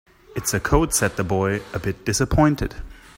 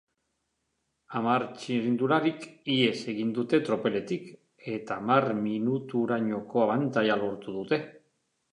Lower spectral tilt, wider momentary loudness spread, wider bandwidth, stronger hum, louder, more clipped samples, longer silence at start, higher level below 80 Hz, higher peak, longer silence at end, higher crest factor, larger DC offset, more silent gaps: second, -4.5 dB/octave vs -6.5 dB/octave; about the same, 11 LU vs 11 LU; first, 16.5 kHz vs 10.5 kHz; neither; first, -21 LUFS vs -28 LUFS; neither; second, 0.35 s vs 1.1 s; first, -34 dBFS vs -74 dBFS; first, -2 dBFS vs -8 dBFS; second, 0.2 s vs 0.55 s; about the same, 20 dB vs 22 dB; neither; neither